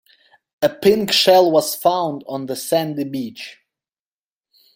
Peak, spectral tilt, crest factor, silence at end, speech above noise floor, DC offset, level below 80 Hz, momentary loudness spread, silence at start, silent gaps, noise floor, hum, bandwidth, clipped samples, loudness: -2 dBFS; -4 dB/octave; 18 dB; 1.25 s; over 73 dB; under 0.1%; -60 dBFS; 15 LU; 0.6 s; none; under -90 dBFS; none; 16.5 kHz; under 0.1%; -17 LUFS